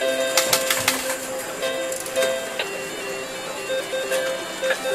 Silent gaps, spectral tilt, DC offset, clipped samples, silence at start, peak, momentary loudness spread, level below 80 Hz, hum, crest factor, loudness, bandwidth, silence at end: none; -1 dB/octave; under 0.1%; under 0.1%; 0 s; -2 dBFS; 10 LU; -60 dBFS; none; 22 dB; -23 LUFS; 16 kHz; 0 s